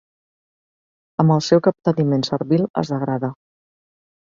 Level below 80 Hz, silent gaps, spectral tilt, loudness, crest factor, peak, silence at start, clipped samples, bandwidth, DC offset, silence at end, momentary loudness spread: -60 dBFS; 2.70-2.74 s; -7 dB/octave; -19 LUFS; 20 dB; -2 dBFS; 1.2 s; under 0.1%; 7.6 kHz; under 0.1%; 0.9 s; 9 LU